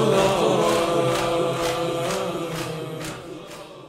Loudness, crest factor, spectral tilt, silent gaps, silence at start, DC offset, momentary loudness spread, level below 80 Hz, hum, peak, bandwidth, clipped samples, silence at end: -23 LUFS; 16 dB; -4.5 dB/octave; none; 0 s; under 0.1%; 16 LU; -50 dBFS; none; -6 dBFS; 16 kHz; under 0.1%; 0 s